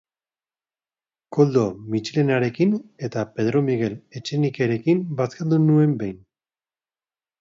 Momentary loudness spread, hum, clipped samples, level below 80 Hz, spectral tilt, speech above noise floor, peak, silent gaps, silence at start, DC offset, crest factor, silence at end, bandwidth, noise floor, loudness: 10 LU; none; under 0.1%; -62 dBFS; -8 dB/octave; over 69 dB; -4 dBFS; none; 1.3 s; under 0.1%; 18 dB; 1.25 s; 7.6 kHz; under -90 dBFS; -22 LUFS